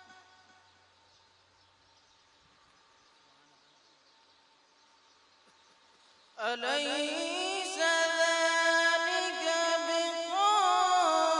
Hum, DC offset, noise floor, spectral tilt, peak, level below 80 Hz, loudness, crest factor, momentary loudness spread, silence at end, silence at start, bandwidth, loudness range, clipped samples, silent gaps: none; under 0.1%; -65 dBFS; 1 dB/octave; -14 dBFS; -88 dBFS; -28 LUFS; 18 dB; 7 LU; 0 s; 6.4 s; 11 kHz; 11 LU; under 0.1%; none